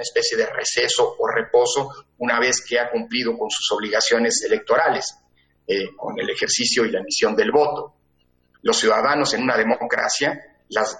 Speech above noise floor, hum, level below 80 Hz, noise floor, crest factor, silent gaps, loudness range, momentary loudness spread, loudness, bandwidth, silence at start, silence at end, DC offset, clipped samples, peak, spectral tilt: 43 dB; none; -62 dBFS; -64 dBFS; 18 dB; none; 1 LU; 8 LU; -20 LUFS; 9.4 kHz; 0 s; 0 s; under 0.1%; under 0.1%; -4 dBFS; -1.5 dB/octave